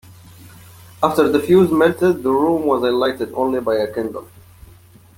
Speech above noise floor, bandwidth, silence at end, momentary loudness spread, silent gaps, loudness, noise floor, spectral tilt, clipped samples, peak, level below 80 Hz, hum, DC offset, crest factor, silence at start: 29 dB; 17 kHz; 0.95 s; 9 LU; none; -17 LUFS; -46 dBFS; -6.5 dB/octave; under 0.1%; -2 dBFS; -52 dBFS; none; under 0.1%; 16 dB; 0.45 s